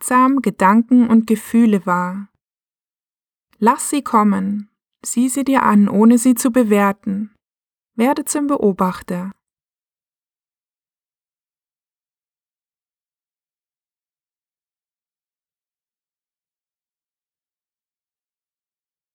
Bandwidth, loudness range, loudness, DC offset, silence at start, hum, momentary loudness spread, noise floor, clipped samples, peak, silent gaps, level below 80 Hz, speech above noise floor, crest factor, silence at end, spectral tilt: 18.5 kHz; 8 LU; -16 LUFS; under 0.1%; 0 s; none; 14 LU; under -90 dBFS; under 0.1%; 0 dBFS; none; -62 dBFS; over 75 dB; 18 dB; 9.8 s; -5.5 dB/octave